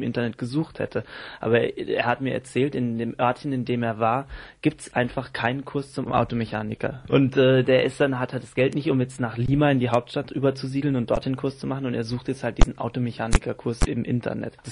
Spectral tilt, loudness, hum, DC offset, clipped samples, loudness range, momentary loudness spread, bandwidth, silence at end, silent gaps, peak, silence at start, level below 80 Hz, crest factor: -6.5 dB/octave; -25 LUFS; none; under 0.1%; under 0.1%; 4 LU; 9 LU; 11 kHz; 0 s; none; -2 dBFS; 0 s; -34 dBFS; 22 dB